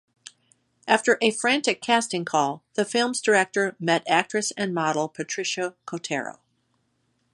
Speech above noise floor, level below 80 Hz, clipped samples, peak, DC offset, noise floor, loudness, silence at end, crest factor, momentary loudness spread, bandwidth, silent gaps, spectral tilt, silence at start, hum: 47 dB; -76 dBFS; under 0.1%; -2 dBFS; under 0.1%; -71 dBFS; -24 LUFS; 1 s; 24 dB; 9 LU; 11.5 kHz; none; -3 dB/octave; 0.85 s; none